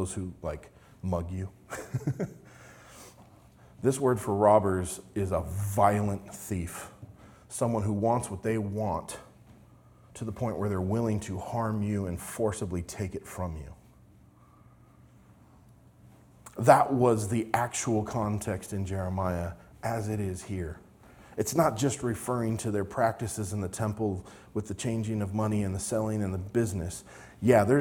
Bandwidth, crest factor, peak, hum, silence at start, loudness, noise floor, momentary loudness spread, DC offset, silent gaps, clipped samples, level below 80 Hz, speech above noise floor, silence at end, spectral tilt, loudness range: 19 kHz; 26 dB; -4 dBFS; none; 0 s; -30 LUFS; -57 dBFS; 15 LU; under 0.1%; none; under 0.1%; -56 dBFS; 28 dB; 0 s; -6.5 dB/octave; 9 LU